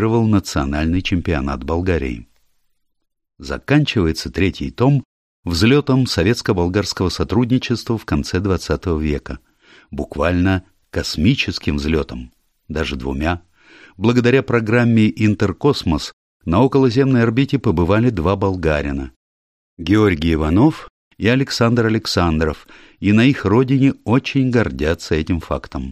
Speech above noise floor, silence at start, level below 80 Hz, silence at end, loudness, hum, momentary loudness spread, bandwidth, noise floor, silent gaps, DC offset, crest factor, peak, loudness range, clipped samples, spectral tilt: 48 dB; 0 s; -34 dBFS; 0 s; -17 LUFS; none; 11 LU; 14.5 kHz; -64 dBFS; 5.05-5.43 s, 16.13-16.40 s, 19.16-19.77 s, 20.90-21.11 s; under 0.1%; 16 dB; -2 dBFS; 5 LU; under 0.1%; -6.5 dB/octave